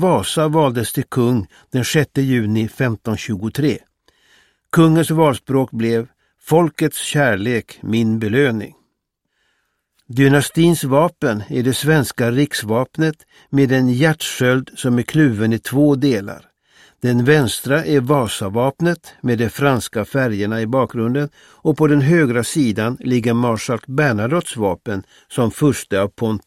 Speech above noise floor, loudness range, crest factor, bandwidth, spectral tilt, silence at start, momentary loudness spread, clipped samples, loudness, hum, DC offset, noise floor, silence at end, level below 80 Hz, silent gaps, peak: 56 dB; 3 LU; 16 dB; 16 kHz; -6 dB/octave; 0 s; 8 LU; under 0.1%; -17 LUFS; none; under 0.1%; -73 dBFS; 0.05 s; -52 dBFS; none; 0 dBFS